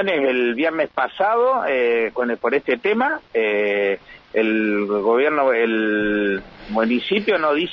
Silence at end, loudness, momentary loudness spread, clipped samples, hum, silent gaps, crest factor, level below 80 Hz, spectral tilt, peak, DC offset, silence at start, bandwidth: 0 s; -20 LUFS; 5 LU; under 0.1%; none; none; 14 dB; -54 dBFS; -7 dB/octave; -6 dBFS; under 0.1%; 0 s; 6 kHz